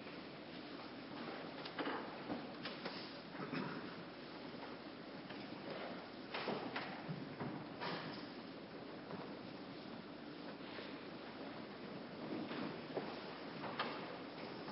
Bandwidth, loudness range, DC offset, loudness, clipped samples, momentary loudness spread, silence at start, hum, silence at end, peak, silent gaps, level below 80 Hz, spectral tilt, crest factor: 5.6 kHz; 4 LU; under 0.1%; -48 LUFS; under 0.1%; 7 LU; 0 s; none; 0 s; -28 dBFS; none; -78 dBFS; -3.5 dB/octave; 20 dB